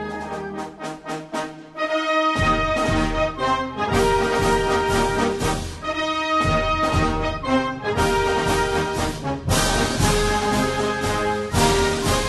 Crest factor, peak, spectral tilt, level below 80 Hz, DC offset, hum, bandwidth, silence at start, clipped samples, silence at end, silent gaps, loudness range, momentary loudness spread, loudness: 16 dB; -6 dBFS; -4.5 dB/octave; -32 dBFS; under 0.1%; none; 12.5 kHz; 0 s; under 0.1%; 0 s; none; 2 LU; 10 LU; -21 LUFS